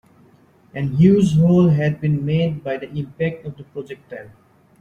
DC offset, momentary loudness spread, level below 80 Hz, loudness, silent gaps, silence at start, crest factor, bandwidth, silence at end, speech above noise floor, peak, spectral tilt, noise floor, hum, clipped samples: under 0.1%; 20 LU; -50 dBFS; -18 LUFS; none; 0.75 s; 16 dB; 9 kHz; 0.55 s; 34 dB; -2 dBFS; -8.5 dB/octave; -52 dBFS; none; under 0.1%